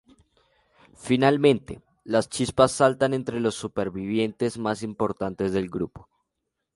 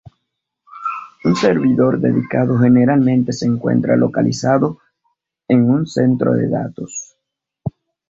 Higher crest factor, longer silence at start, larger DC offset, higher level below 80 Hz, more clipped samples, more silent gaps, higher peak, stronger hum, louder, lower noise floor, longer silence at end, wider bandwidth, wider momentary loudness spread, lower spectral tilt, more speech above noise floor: first, 22 dB vs 14 dB; first, 1 s vs 0.7 s; neither; about the same, -54 dBFS vs -52 dBFS; neither; neither; about the same, -2 dBFS vs -2 dBFS; neither; second, -24 LUFS vs -16 LUFS; about the same, -81 dBFS vs -78 dBFS; first, 0.75 s vs 0.4 s; first, 11.5 kHz vs 7.8 kHz; second, 11 LU vs 15 LU; second, -5.5 dB/octave vs -7 dB/octave; second, 57 dB vs 63 dB